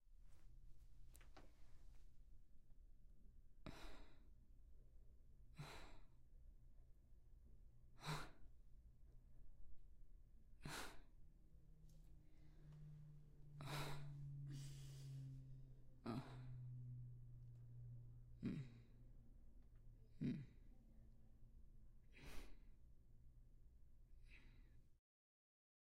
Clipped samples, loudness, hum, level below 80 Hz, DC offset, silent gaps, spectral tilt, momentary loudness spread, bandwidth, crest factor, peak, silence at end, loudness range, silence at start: under 0.1%; -56 LUFS; none; -66 dBFS; under 0.1%; none; -5.5 dB/octave; 17 LU; 15.5 kHz; 22 dB; -36 dBFS; 1 s; 12 LU; 0 s